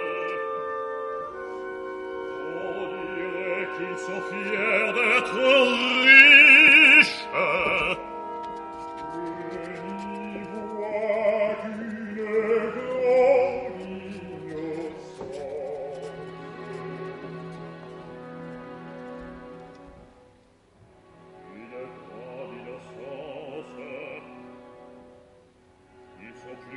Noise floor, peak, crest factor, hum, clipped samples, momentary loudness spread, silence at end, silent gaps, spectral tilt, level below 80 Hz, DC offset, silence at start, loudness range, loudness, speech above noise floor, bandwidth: -58 dBFS; 0 dBFS; 24 dB; none; under 0.1%; 25 LU; 0 s; none; -3.5 dB/octave; -62 dBFS; under 0.1%; 0 s; 27 LU; -18 LUFS; 35 dB; 11.5 kHz